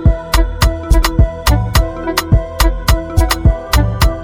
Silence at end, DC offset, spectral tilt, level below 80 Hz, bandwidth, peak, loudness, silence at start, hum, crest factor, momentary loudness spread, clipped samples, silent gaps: 0 s; under 0.1%; -5 dB/octave; -14 dBFS; 17.5 kHz; 0 dBFS; -14 LUFS; 0 s; none; 12 dB; 3 LU; under 0.1%; none